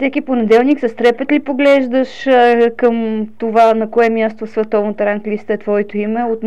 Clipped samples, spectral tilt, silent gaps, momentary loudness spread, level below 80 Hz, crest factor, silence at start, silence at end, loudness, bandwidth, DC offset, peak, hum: under 0.1%; -6.5 dB/octave; none; 7 LU; -58 dBFS; 12 dB; 0 s; 0 s; -14 LUFS; 8.4 kHz; 2%; -2 dBFS; none